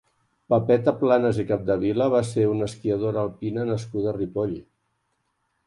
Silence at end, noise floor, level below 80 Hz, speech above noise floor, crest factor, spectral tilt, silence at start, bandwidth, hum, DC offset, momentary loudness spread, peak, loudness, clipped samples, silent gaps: 1.05 s; -73 dBFS; -54 dBFS; 51 dB; 18 dB; -7.5 dB/octave; 0.5 s; 11.5 kHz; none; under 0.1%; 8 LU; -6 dBFS; -24 LUFS; under 0.1%; none